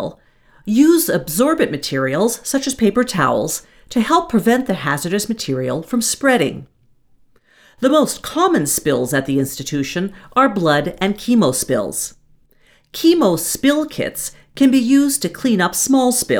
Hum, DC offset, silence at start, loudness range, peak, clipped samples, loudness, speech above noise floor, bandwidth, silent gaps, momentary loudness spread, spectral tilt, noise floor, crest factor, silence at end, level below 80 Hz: none; under 0.1%; 0 s; 3 LU; -2 dBFS; under 0.1%; -17 LUFS; 37 dB; over 20 kHz; none; 9 LU; -4 dB/octave; -54 dBFS; 16 dB; 0 s; -48 dBFS